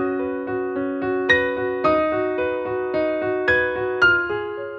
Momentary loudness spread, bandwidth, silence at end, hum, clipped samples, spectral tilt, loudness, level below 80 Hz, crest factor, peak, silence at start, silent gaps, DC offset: 8 LU; 6.8 kHz; 0 s; none; under 0.1%; -6 dB/octave; -21 LUFS; -50 dBFS; 18 dB; -4 dBFS; 0 s; none; under 0.1%